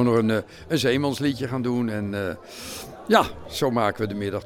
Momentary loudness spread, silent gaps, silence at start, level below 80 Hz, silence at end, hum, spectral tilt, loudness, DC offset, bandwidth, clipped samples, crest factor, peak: 14 LU; none; 0 s; -52 dBFS; 0 s; none; -5.5 dB/octave; -24 LUFS; under 0.1%; 17.5 kHz; under 0.1%; 20 dB; -4 dBFS